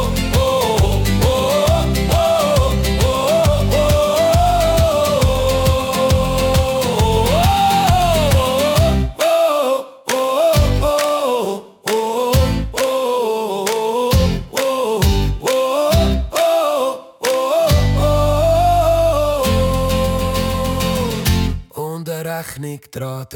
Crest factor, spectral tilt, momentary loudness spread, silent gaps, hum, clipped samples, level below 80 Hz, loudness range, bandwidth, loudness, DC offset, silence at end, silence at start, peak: 14 dB; -5 dB/octave; 7 LU; none; none; under 0.1%; -24 dBFS; 3 LU; 18 kHz; -16 LUFS; under 0.1%; 0 s; 0 s; -2 dBFS